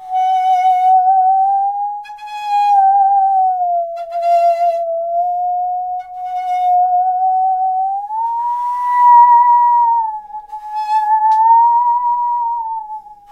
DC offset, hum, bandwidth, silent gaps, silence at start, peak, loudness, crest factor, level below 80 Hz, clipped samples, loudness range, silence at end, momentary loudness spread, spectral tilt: under 0.1%; none; 8 kHz; none; 0 s; 0 dBFS; -14 LUFS; 12 dB; -60 dBFS; under 0.1%; 5 LU; 0.2 s; 14 LU; -1 dB/octave